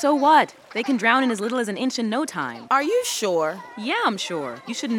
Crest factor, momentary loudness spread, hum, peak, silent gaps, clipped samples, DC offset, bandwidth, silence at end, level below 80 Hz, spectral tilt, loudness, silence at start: 20 dB; 12 LU; none; -2 dBFS; none; under 0.1%; under 0.1%; 19 kHz; 0 s; -74 dBFS; -3 dB/octave; -22 LUFS; 0 s